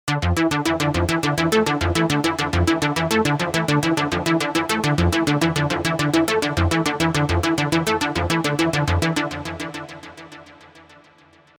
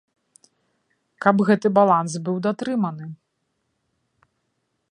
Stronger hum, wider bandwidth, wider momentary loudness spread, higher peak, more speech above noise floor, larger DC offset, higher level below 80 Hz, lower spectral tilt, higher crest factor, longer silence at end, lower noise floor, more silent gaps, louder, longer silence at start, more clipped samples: neither; first, over 20 kHz vs 10 kHz; second, 7 LU vs 11 LU; about the same, -4 dBFS vs -2 dBFS; second, 32 dB vs 54 dB; neither; first, -38 dBFS vs -70 dBFS; second, -5 dB/octave vs -7 dB/octave; about the same, 18 dB vs 22 dB; second, 0.8 s vs 1.8 s; second, -52 dBFS vs -74 dBFS; neither; about the same, -20 LUFS vs -20 LUFS; second, 0.05 s vs 1.2 s; neither